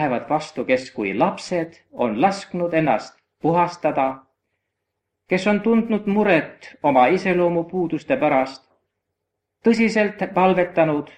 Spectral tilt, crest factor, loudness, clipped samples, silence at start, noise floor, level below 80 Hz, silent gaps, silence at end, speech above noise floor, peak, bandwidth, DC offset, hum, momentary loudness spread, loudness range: -6.5 dB/octave; 18 dB; -20 LUFS; under 0.1%; 0 s; -79 dBFS; -60 dBFS; none; 0.15 s; 60 dB; -2 dBFS; 9.8 kHz; under 0.1%; none; 8 LU; 3 LU